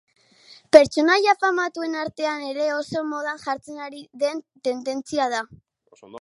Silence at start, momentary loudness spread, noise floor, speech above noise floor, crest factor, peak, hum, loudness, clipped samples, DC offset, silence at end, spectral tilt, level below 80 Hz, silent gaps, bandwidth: 0.5 s; 15 LU; -52 dBFS; 30 dB; 22 dB; 0 dBFS; none; -22 LUFS; under 0.1%; under 0.1%; 0 s; -3.5 dB/octave; -64 dBFS; none; 11.5 kHz